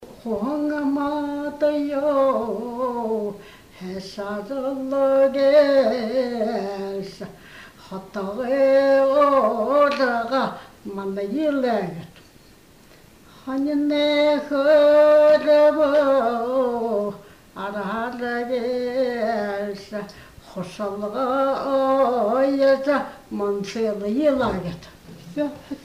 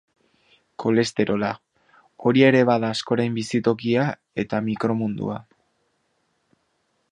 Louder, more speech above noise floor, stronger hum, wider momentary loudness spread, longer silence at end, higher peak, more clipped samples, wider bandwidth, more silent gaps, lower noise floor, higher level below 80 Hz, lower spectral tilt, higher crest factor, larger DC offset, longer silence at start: about the same, -21 LUFS vs -22 LUFS; second, 30 dB vs 49 dB; neither; first, 17 LU vs 13 LU; second, 0.05 s vs 1.7 s; second, -6 dBFS vs -2 dBFS; neither; first, 15 kHz vs 10.5 kHz; neither; second, -50 dBFS vs -70 dBFS; first, -56 dBFS vs -62 dBFS; about the same, -6 dB/octave vs -6 dB/octave; second, 16 dB vs 22 dB; neither; second, 0 s vs 0.8 s